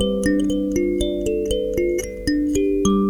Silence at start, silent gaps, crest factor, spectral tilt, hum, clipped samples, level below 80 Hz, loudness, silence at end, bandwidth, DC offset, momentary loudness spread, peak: 0 s; none; 16 dB; -5.5 dB/octave; none; under 0.1%; -34 dBFS; -21 LUFS; 0 s; 17.5 kHz; under 0.1%; 4 LU; -4 dBFS